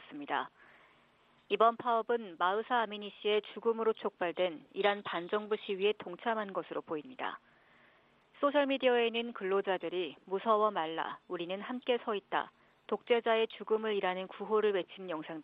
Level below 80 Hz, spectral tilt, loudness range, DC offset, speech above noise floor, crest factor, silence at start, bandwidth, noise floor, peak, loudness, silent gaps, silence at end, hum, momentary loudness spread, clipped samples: -84 dBFS; -7 dB/octave; 3 LU; under 0.1%; 34 dB; 20 dB; 0 s; 5 kHz; -67 dBFS; -14 dBFS; -34 LUFS; none; 0 s; none; 11 LU; under 0.1%